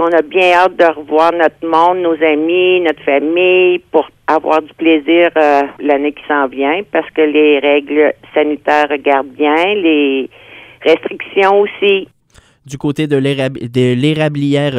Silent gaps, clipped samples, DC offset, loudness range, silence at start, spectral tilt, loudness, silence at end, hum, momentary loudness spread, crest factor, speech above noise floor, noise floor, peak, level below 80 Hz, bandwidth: none; under 0.1%; under 0.1%; 3 LU; 0 s; -6.5 dB/octave; -12 LUFS; 0 s; none; 6 LU; 12 dB; 36 dB; -48 dBFS; 0 dBFS; -56 dBFS; 11 kHz